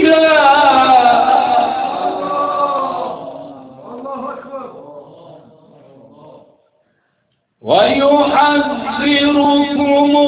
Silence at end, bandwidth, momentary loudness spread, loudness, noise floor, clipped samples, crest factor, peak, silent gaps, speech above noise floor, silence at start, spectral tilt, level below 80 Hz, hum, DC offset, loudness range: 0 s; 4 kHz; 21 LU; -12 LUFS; -65 dBFS; under 0.1%; 14 dB; 0 dBFS; none; 53 dB; 0 s; -8 dB/octave; -52 dBFS; none; under 0.1%; 19 LU